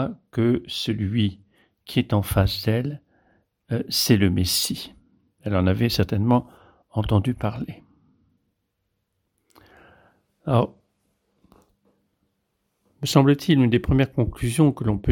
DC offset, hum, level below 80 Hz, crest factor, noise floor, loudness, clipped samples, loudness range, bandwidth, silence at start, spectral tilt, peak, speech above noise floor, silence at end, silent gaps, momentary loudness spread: under 0.1%; none; -42 dBFS; 20 dB; -76 dBFS; -22 LUFS; under 0.1%; 9 LU; 17.5 kHz; 0 s; -6 dB/octave; -4 dBFS; 54 dB; 0 s; none; 12 LU